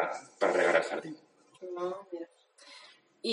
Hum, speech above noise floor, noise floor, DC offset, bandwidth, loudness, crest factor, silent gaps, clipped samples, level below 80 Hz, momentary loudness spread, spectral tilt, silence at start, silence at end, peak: none; 25 dB; -57 dBFS; under 0.1%; 11 kHz; -31 LUFS; 24 dB; none; under 0.1%; under -90 dBFS; 24 LU; -3.5 dB/octave; 0 s; 0 s; -10 dBFS